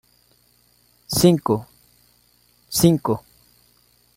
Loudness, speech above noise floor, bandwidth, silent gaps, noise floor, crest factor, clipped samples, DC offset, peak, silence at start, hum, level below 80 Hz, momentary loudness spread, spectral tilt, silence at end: -20 LUFS; 42 dB; 16.5 kHz; none; -59 dBFS; 20 dB; under 0.1%; under 0.1%; -2 dBFS; 1.1 s; 60 Hz at -55 dBFS; -50 dBFS; 9 LU; -5.5 dB/octave; 0.95 s